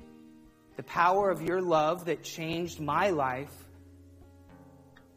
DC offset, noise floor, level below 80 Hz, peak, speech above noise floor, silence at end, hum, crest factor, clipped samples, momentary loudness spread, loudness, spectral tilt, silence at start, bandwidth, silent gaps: under 0.1%; -56 dBFS; -64 dBFS; -12 dBFS; 27 dB; 0.45 s; none; 20 dB; under 0.1%; 13 LU; -29 LUFS; -5.5 dB/octave; 0 s; 15.5 kHz; none